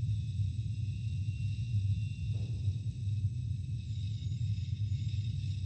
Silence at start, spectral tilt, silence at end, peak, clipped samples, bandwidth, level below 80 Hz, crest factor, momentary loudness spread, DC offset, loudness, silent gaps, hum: 0 s; -7 dB/octave; 0 s; -22 dBFS; under 0.1%; 8.6 kHz; -48 dBFS; 12 dB; 3 LU; under 0.1%; -36 LUFS; none; none